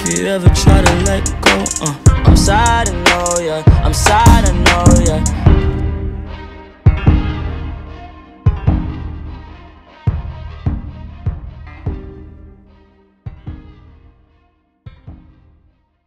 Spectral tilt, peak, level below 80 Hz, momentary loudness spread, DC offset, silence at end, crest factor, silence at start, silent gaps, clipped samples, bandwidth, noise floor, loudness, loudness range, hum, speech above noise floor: -5 dB/octave; 0 dBFS; -20 dBFS; 22 LU; under 0.1%; 0.9 s; 14 dB; 0 s; none; 0.3%; 15 kHz; -57 dBFS; -13 LUFS; 17 LU; none; 46 dB